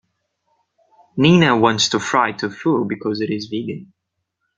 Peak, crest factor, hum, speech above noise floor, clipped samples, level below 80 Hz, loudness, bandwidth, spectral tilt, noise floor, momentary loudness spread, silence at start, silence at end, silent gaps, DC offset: 0 dBFS; 20 dB; none; 59 dB; under 0.1%; -56 dBFS; -17 LUFS; 9.2 kHz; -5 dB/octave; -76 dBFS; 14 LU; 1.15 s; 0.75 s; none; under 0.1%